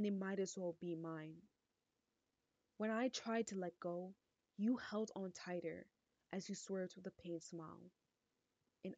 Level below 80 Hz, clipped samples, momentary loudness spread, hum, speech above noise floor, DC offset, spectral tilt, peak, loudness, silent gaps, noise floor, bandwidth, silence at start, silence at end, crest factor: -88 dBFS; under 0.1%; 14 LU; none; 44 dB; under 0.1%; -5 dB/octave; -30 dBFS; -46 LUFS; none; -90 dBFS; 9 kHz; 0 s; 0 s; 18 dB